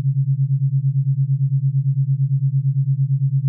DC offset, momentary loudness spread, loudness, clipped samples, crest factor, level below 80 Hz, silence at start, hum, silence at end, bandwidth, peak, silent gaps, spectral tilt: under 0.1%; 1 LU; -19 LUFS; under 0.1%; 6 dB; -66 dBFS; 0 s; none; 0 s; 0.3 kHz; -12 dBFS; none; -28.5 dB/octave